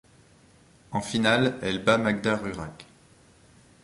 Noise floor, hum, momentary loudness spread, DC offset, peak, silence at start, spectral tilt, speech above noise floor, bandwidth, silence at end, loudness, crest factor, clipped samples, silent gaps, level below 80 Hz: -57 dBFS; none; 13 LU; under 0.1%; -8 dBFS; 0.9 s; -5 dB/octave; 32 dB; 11.5 kHz; 1 s; -25 LUFS; 20 dB; under 0.1%; none; -56 dBFS